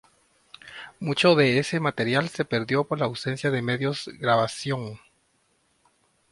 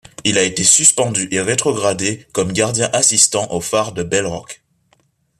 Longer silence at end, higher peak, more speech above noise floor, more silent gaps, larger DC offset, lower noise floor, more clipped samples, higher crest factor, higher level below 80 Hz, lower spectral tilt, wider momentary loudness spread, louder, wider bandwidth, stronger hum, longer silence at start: first, 1.35 s vs 0.85 s; second, -6 dBFS vs 0 dBFS; about the same, 44 dB vs 43 dB; neither; neither; first, -68 dBFS vs -60 dBFS; neither; about the same, 20 dB vs 18 dB; second, -64 dBFS vs -52 dBFS; first, -5.5 dB/octave vs -2 dB/octave; first, 13 LU vs 10 LU; second, -24 LUFS vs -14 LUFS; second, 11.5 kHz vs 15 kHz; neither; first, 0.65 s vs 0.2 s